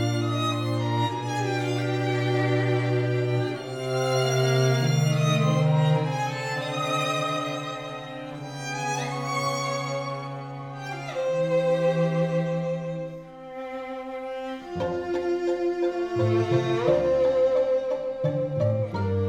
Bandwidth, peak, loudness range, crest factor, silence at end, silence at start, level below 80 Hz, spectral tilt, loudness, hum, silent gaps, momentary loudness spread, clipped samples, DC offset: 16.5 kHz; -8 dBFS; 6 LU; 16 dB; 0 s; 0 s; -58 dBFS; -6 dB/octave; -26 LUFS; none; none; 12 LU; under 0.1%; under 0.1%